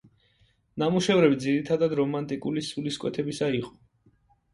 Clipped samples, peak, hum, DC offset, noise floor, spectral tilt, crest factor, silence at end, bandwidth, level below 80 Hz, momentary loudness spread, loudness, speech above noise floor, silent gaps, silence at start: under 0.1%; -8 dBFS; none; under 0.1%; -65 dBFS; -6 dB/octave; 20 dB; 0.85 s; 11.5 kHz; -62 dBFS; 10 LU; -26 LUFS; 40 dB; none; 0.75 s